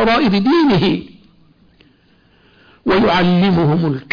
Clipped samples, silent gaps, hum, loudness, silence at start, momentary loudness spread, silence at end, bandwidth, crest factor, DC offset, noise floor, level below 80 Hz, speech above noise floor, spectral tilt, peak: under 0.1%; none; none; -14 LUFS; 0 s; 6 LU; 0.1 s; 5.2 kHz; 10 dB; under 0.1%; -53 dBFS; -42 dBFS; 39 dB; -8 dB/octave; -6 dBFS